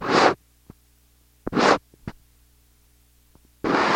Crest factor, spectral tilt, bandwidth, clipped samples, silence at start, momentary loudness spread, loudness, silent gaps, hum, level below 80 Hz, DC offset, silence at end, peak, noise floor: 24 dB; -4 dB/octave; 16.5 kHz; under 0.1%; 0 s; 22 LU; -22 LUFS; none; 60 Hz at -55 dBFS; -54 dBFS; under 0.1%; 0 s; 0 dBFS; -59 dBFS